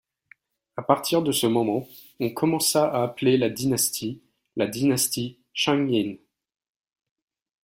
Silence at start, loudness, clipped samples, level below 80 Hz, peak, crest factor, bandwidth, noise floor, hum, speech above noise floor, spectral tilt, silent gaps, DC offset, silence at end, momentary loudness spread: 0.75 s; -24 LUFS; under 0.1%; -64 dBFS; -4 dBFS; 22 dB; 16.5 kHz; -58 dBFS; none; 35 dB; -4 dB/octave; none; under 0.1%; 1.5 s; 12 LU